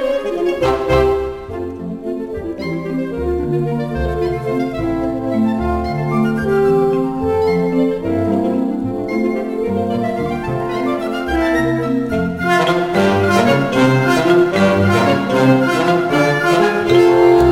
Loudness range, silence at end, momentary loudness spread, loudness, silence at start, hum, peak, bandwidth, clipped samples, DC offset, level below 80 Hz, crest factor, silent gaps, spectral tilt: 6 LU; 0 s; 8 LU; -16 LUFS; 0 s; none; 0 dBFS; 16 kHz; under 0.1%; under 0.1%; -34 dBFS; 14 dB; none; -6.5 dB/octave